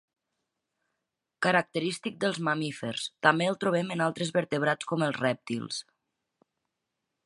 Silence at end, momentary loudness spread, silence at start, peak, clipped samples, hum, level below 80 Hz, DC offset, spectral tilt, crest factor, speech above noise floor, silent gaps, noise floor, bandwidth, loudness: 1.45 s; 9 LU; 1.4 s; -6 dBFS; under 0.1%; none; -74 dBFS; under 0.1%; -5 dB/octave; 26 dB; 56 dB; none; -85 dBFS; 11.5 kHz; -29 LUFS